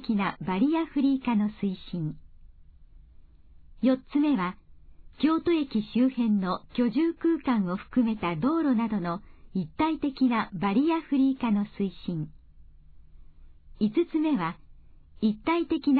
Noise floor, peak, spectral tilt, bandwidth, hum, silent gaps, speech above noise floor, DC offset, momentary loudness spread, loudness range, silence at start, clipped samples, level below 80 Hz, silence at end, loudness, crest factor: -52 dBFS; -12 dBFS; -10.5 dB/octave; 4.7 kHz; none; none; 26 dB; under 0.1%; 9 LU; 5 LU; 0 s; under 0.1%; -54 dBFS; 0 s; -27 LUFS; 14 dB